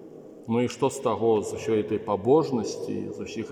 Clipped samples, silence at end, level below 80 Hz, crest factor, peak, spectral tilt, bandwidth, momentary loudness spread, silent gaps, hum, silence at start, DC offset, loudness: under 0.1%; 0 s; -66 dBFS; 18 dB; -8 dBFS; -6 dB/octave; 15 kHz; 12 LU; none; none; 0 s; under 0.1%; -26 LUFS